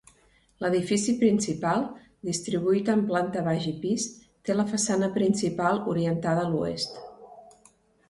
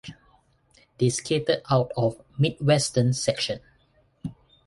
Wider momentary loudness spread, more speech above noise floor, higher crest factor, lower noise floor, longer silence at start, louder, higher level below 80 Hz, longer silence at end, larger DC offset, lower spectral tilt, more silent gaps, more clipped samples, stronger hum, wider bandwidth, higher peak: second, 9 LU vs 18 LU; about the same, 36 dB vs 39 dB; about the same, 16 dB vs 18 dB; about the same, -62 dBFS vs -63 dBFS; first, 0.6 s vs 0.05 s; second, -27 LUFS vs -24 LUFS; second, -62 dBFS vs -56 dBFS; first, 0.65 s vs 0.35 s; neither; about the same, -5 dB/octave vs -5 dB/octave; neither; neither; neither; about the same, 11.5 kHz vs 11.5 kHz; about the same, -10 dBFS vs -8 dBFS